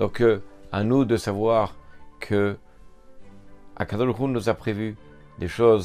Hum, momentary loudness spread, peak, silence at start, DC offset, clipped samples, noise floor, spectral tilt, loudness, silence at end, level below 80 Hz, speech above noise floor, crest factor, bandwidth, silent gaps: none; 12 LU; -6 dBFS; 0 s; under 0.1%; under 0.1%; -46 dBFS; -7 dB/octave; -24 LUFS; 0 s; -50 dBFS; 24 dB; 18 dB; 14.5 kHz; none